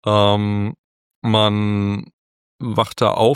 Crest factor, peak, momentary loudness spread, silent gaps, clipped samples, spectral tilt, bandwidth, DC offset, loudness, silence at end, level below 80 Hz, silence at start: 18 dB; 0 dBFS; 12 LU; 0.78-1.22 s, 2.13-2.59 s; under 0.1%; -6.5 dB/octave; 15 kHz; under 0.1%; -19 LUFS; 0 s; -54 dBFS; 0.05 s